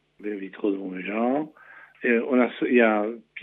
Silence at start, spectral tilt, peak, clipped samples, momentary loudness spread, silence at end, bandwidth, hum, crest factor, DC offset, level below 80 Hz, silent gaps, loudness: 0.2 s; -9 dB/octave; -6 dBFS; under 0.1%; 14 LU; 0 s; 4 kHz; none; 18 dB; under 0.1%; -80 dBFS; none; -24 LUFS